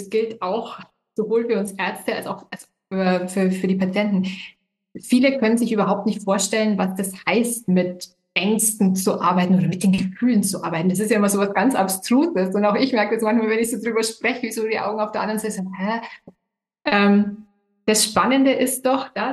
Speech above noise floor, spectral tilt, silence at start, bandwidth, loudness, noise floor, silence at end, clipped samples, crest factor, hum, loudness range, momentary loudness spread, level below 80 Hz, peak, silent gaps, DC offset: 32 dB; -4.5 dB/octave; 0 s; 12.5 kHz; -20 LUFS; -52 dBFS; 0 s; under 0.1%; 18 dB; none; 4 LU; 11 LU; -62 dBFS; -4 dBFS; none; under 0.1%